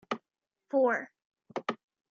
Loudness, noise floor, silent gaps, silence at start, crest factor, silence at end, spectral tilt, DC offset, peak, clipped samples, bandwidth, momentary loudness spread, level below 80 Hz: -32 LUFS; -88 dBFS; 1.25-1.32 s; 0.1 s; 18 dB; 0.35 s; -5 dB/octave; under 0.1%; -16 dBFS; under 0.1%; 7.2 kHz; 17 LU; -88 dBFS